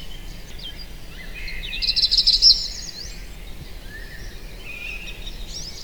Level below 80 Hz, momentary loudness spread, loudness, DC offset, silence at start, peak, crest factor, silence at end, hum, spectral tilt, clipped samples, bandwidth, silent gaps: -36 dBFS; 26 LU; -17 LUFS; 0.7%; 0 s; 0 dBFS; 24 dB; 0 s; none; -0.5 dB/octave; under 0.1%; over 20 kHz; none